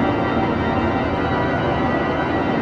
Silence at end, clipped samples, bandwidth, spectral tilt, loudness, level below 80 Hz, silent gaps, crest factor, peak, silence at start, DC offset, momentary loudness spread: 0 s; under 0.1%; 7.8 kHz; -8 dB/octave; -20 LUFS; -36 dBFS; none; 12 dB; -8 dBFS; 0 s; under 0.1%; 1 LU